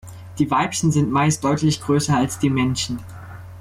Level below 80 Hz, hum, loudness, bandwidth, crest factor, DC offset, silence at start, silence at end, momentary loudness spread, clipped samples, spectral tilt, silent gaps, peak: -48 dBFS; none; -20 LUFS; 15 kHz; 12 dB; under 0.1%; 0.05 s; 0 s; 18 LU; under 0.1%; -5 dB/octave; none; -8 dBFS